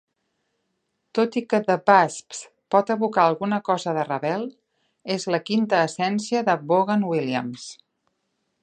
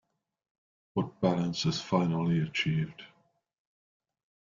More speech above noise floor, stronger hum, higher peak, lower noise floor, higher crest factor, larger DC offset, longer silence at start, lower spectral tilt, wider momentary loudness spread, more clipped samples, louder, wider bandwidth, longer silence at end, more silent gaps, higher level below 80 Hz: first, 53 dB vs 41 dB; neither; first, -2 dBFS vs -10 dBFS; first, -75 dBFS vs -71 dBFS; about the same, 22 dB vs 22 dB; neither; first, 1.15 s vs 0.95 s; about the same, -5 dB/octave vs -6 dB/octave; first, 15 LU vs 8 LU; neither; first, -22 LUFS vs -30 LUFS; first, 10 kHz vs 7.4 kHz; second, 0.9 s vs 1.45 s; neither; second, -74 dBFS vs -66 dBFS